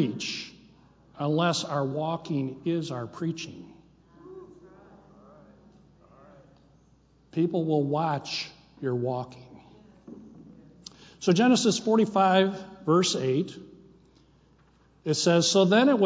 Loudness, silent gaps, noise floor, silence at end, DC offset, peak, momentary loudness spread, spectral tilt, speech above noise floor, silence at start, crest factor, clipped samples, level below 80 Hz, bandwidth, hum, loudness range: -26 LUFS; none; -61 dBFS; 0 s; under 0.1%; -8 dBFS; 26 LU; -5 dB/octave; 36 dB; 0 s; 20 dB; under 0.1%; -66 dBFS; 8 kHz; none; 12 LU